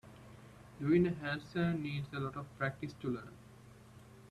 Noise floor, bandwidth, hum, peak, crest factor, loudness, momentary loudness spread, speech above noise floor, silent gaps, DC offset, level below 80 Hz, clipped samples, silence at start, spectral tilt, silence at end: -57 dBFS; 12.5 kHz; none; -18 dBFS; 20 dB; -37 LUFS; 26 LU; 21 dB; none; under 0.1%; -66 dBFS; under 0.1%; 0.05 s; -8 dB/octave; 0.05 s